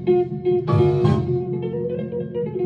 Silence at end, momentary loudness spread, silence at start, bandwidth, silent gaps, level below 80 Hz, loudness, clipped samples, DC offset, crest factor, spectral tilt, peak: 0 s; 9 LU; 0 s; 5.8 kHz; none; -50 dBFS; -21 LUFS; under 0.1%; under 0.1%; 16 dB; -10 dB/octave; -6 dBFS